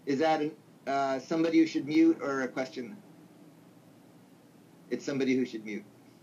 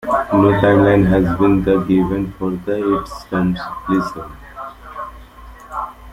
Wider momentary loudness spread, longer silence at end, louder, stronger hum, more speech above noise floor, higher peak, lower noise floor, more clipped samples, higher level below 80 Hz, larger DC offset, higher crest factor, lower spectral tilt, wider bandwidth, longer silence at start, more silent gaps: second, 17 LU vs 20 LU; first, 0.4 s vs 0 s; second, -30 LUFS vs -16 LUFS; neither; first, 28 dB vs 23 dB; second, -14 dBFS vs -2 dBFS; first, -57 dBFS vs -38 dBFS; neither; second, -86 dBFS vs -36 dBFS; neither; about the same, 16 dB vs 16 dB; second, -5.5 dB/octave vs -8.5 dB/octave; second, 7.6 kHz vs 15 kHz; about the same, 0.05 s vs 0 s; neither